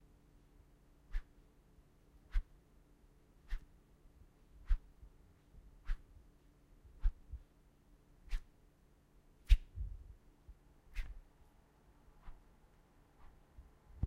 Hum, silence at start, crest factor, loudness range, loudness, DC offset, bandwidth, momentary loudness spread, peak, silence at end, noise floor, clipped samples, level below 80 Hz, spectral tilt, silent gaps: none; 1.15 s; 30 dB; 14 LU; -45 LUFS; under 0.1%; 6.8 kHz; 25 LU; -14 dBFS; 0 s; -68 dBFS; under 0.1%; -44 dBFS; -5.5 dB/octave; none